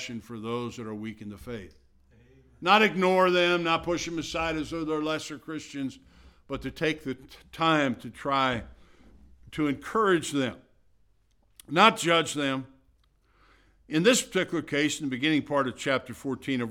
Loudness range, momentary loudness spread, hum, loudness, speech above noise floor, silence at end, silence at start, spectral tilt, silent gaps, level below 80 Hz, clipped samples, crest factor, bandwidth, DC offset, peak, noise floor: 6 LU; 16 LU; none; -27 LUFS; 38 dB; 0 s; 0 s; -4 dB/octave; none; -56 dBFS; under 0.1%; 24 dB; 16.5 kHz; under 0.1%; -4 dBFS; -65 dBFS